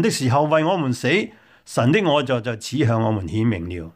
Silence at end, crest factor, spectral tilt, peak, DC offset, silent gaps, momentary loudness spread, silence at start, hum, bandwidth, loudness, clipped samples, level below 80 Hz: 0.05 s; 16 dB; -6 dB/octave; -4 dBFS; under 0.1%; none; 7 LU; 0 s; none; 15.5 kHz; -20 LUFS; under 0.1%; -50 dBFS